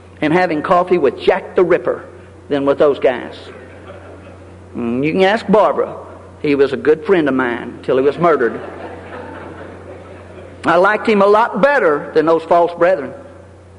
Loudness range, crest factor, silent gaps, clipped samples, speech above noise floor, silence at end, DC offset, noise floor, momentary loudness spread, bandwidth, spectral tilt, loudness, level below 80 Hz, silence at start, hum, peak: 5 LU; 16 dB; none; under 0.1%; 25 dB; 0.45 s; under 0.1%; -39 dBFS; 22 LU; 10.5 kHz; -7 dB/octave; -15 LUFS; -48 dBFS; 0.2 s; none; 0 dBFS